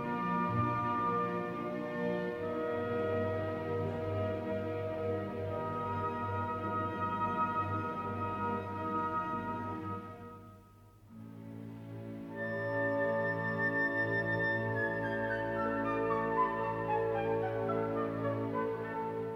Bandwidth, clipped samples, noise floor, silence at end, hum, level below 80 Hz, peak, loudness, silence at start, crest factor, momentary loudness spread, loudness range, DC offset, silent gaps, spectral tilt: 15.5 kHz; under 0.1%; -58 dBFS; 0 s; none; -64 dBFS; -20 dBFS; -35 LUFS; 0 s; 14 dB; 9 LU; 7 LU; under 0.1%; none; -8.5 dB/octave